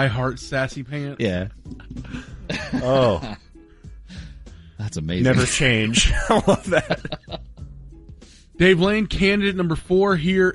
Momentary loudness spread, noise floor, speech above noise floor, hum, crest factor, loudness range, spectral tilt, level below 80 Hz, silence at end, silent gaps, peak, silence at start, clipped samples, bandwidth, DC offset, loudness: 22 LU; -44 dBFS; 24 dB; none; 18 dB; 6 LU; -5 dB/octave; -34 dBFS; 0 s; none; -4 dBFS; 0 s; under 0.1%; 11.5 kHz; under 0.1%; -20 LUFS